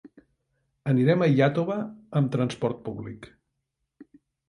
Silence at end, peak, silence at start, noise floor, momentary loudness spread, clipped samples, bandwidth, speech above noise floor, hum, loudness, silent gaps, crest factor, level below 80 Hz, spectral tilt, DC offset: 0.45 s; -8 dBFS; 0.05 s; -80 dBFS; 16 LU; under 0.1%; 10.5 kHz; 56 dB; none; -25 LUFS; none; 18 dB; -62 dBFS; -8 dB/octave; under 0.1%